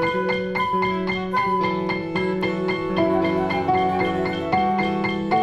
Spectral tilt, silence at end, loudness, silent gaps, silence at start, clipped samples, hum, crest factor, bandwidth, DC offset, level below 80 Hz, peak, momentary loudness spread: -7 dB/octave; 0 s; -22 LUFS; none; 0 s; under 0.1%; none; 14 dB; 11.5 kHz; under 0.1%; -48 dBFS; -8 dBFS; 4 LU